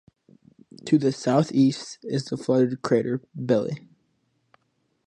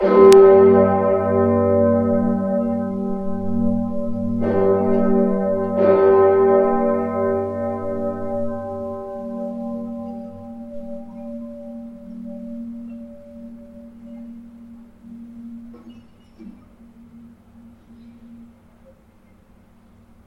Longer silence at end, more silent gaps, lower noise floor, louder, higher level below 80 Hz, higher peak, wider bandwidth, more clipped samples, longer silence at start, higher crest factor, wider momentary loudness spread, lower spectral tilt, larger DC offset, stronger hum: second, 1.3 s vs 1.8 s; neither; first, -72 dBFS vs -51 dBFS; second, -24 LUFS vs -18 LUFS; second, -70 dBFS vs -48 dBFS; second, -6 dBFS vs 0 dBFS; about the same, 10.5 kHz vs 11.5 kHz; neither; first, 0.85 s vs 0 s; about the same, 20 dB vs 20 dB; second, 11 LU vs 24 LU; about the same, -7 dB/octave vs -8 dB/octave; neither; neither